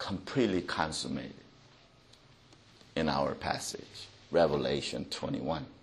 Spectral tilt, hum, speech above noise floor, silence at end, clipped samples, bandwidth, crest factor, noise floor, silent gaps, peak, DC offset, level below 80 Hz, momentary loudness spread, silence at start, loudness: -4.5 dB/octave; none; 27 dB; 0.05 s; under 0.1%; 12.5 kHz; 22 dB; -60 dBFS; none; -12 dBFS; under 0.1%; -58 dBFS; 14 LU; 0 s; -33 LUFS